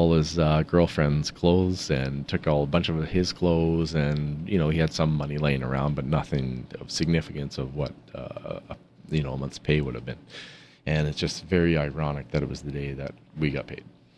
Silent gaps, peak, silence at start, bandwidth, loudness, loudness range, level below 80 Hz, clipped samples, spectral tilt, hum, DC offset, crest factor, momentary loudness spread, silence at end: none; -6 dBFS; 0 s; 11 kHz; -26 LUFS; 7 LU; -42 dBFS; under 0.1%; -6.5 dB/octave; none; under 0.1%; 20 dB; 15 LU; 0.3 s